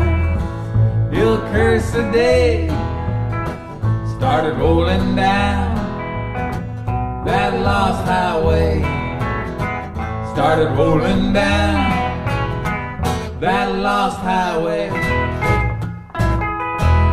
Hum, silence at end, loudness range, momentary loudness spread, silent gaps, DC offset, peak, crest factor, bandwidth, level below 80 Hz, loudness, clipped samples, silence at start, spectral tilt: none; 0 s; 2 LU; 8 LU; none; under 0.1%; -4 dBFS; 14 dB; 13 kHz; -26 dBFS; -18 LUFS; under 0.1%; 0 s; -7 dB/octave